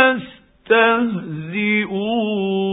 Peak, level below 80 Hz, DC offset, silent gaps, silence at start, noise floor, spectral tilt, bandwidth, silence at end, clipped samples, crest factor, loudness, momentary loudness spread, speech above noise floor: 0 dBFS; -58 dBFS; under 0.1%; none; 0 s; -40 dBFS; -10.5 dB/octave; 4 kHz; 0 s; under 0.1%; 18 dB; -18 LUFS; 11 LU; 22 dB